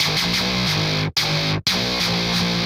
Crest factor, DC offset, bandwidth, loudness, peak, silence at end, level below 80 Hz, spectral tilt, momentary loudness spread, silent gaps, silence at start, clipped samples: 14 dB; under 0.1%; 16 kHz; -19 LUFS; -6 dBFS; 0 s; -42 dBFS; -3.5 dB/octave; 1 LU; none; 0 s; under 0.1%